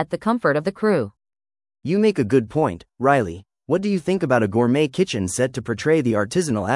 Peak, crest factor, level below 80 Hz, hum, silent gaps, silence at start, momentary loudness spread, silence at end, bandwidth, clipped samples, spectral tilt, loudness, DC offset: -2 dBFS; 18 dB; -56 dBFS; none; none; 0 s; 6 LU; 0 s; 12 kHz; under 0.1%; -6 dB/octave; -21 LUFS; under 0.1%